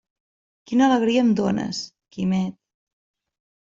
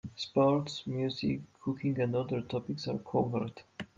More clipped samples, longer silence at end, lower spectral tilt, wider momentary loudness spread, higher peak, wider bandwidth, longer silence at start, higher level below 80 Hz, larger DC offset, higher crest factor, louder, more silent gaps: neither; first, 1.2 s vs 0.15 s; about the same, -6 dB/octave vs -7 dB/octave; first, 13 LU vs 9 LU; first, -8 dBFS vs -16 dBFS; about the same, 7.6 kHz vs 7.8 kHz; first, 0.7 s vs 0.05 s; first, -62 dBFS vs -68 dBFS; neither; about the same, 16 dB vs 16 dB; first, -22 LUFS vs -33 LUFS; neither